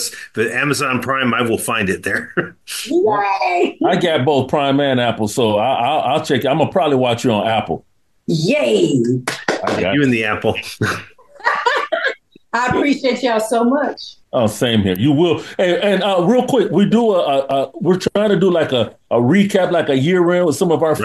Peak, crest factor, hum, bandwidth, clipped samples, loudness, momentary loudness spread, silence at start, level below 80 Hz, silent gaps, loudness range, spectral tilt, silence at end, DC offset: 0 dBFS; 16 dB; none; 13.5 kHz; under 0.1%; -16 LUFS; 7 LU; 0 s; -54 dBFS; none; 3 LU; -5.5 dB/octave; 0 s; 0.1%